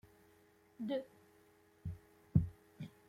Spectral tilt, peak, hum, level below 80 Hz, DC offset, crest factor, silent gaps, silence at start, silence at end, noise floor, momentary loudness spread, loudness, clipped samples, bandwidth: -9 dB/octave; -16 dBFS; none; -60 dBFS; under 0.1%; 26 dB; none; 0.8 s; 0.2 s; -68 dBFS; 18 LU; -41 LUFS; under 0.1%; 15 kHz